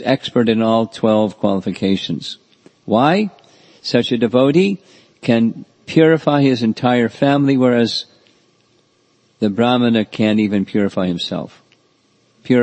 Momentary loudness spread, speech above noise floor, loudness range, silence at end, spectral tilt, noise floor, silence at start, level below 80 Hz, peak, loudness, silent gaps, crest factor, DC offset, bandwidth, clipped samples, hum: 11 LU; 43 dB; 3 LU; 0 s; -7 dB/octave; -58 dBFS; 0 s; -60 dBFS; 0 dBFS; -16 LUFS; none; 16 dB; under 0.1%; 8.6 kHz; under 0.1%; none